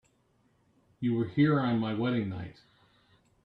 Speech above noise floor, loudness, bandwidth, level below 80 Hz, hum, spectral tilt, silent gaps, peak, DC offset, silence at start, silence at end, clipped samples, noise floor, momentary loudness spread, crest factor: 41 dB; -29 LUFS; 5.2 kHz; -66 dBFS; none; -9.5 dB/octave; none; -14 dBFS; under 0.1%; 1 s; 0.9 s; under 0.1%; -70 dBFS; 13 LU; 18 dB